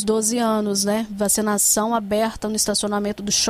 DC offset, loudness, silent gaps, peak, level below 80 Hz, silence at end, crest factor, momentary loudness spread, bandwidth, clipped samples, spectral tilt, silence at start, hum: under 0.1%; -20 LUFS; none; -8 dBFS; -48 dBFS; 0 s; 14 dB; 6 LU; 16 kHz; under 0.1%; -2.5 dB/octave; 0 s; none